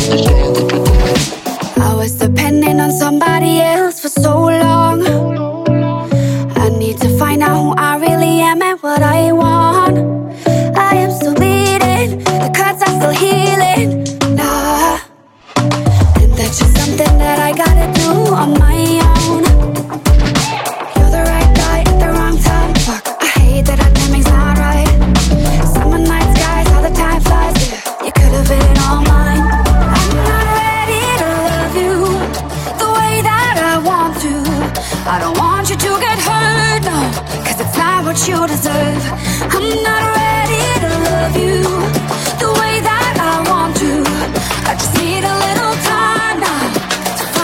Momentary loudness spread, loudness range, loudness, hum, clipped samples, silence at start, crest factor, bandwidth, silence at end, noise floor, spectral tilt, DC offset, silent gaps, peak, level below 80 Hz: 5 LU; 2 LU; -12 LUFS; none; under 0.1%; 0 s; 12 dB; 17 kHz; 0 s; -40 dBFS; -5 dB/octave; under 0.1%; none; 0 dBFS; -16 dBFS